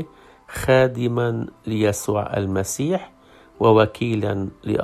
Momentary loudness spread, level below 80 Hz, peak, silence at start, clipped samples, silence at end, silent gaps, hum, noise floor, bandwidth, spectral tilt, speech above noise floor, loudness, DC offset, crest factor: 10 LU; -48 dBFS; -2 dBFS; 0 s; under 0.1%; 0 s; none; none; -40 dBFS; 14.5 kHz; -6 dB/octave; 19 dB; -21 LUFS; under 0.1%; 18 dB